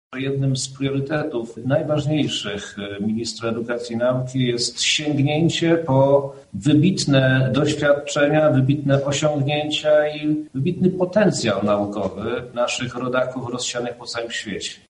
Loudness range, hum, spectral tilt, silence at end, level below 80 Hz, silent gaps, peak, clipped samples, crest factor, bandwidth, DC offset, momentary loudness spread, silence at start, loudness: 5 LU; none; -5 dB/octave; 0.15 s; -54 dBFS; none; -2 dBFS; under 0.1%; 18 dB; 11 kHz; under 0.1%; 9 LU; 0.1 s; -20 LUFS